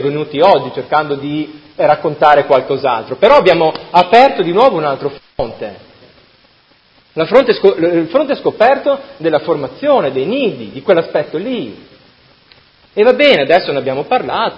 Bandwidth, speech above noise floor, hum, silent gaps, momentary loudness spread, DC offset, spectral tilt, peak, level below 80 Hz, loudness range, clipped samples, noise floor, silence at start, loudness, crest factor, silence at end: 8 kHz; 38 dB; none; none; 13 LU; under 0.1%; -6.5 dB/octave; 0 dBFS; -50 dBFS; 6 LU; 0.3%; -50 dBFS; 0 s; -12 LUFS; 14 dB; 0 s